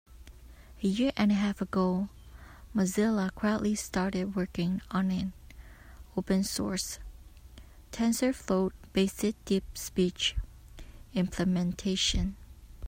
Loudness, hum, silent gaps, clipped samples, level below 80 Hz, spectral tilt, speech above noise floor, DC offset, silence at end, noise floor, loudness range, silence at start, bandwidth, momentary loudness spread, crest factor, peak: -30 LUFS; none; none; under 0.1%; -46 dBFS; -5 dB/octave; 22 dB; under 0.1%; 0 s; -51 dBFS; 3 LU; 0.1 s; 16 kHz; 10 LU; 18 dB; -14 dBFS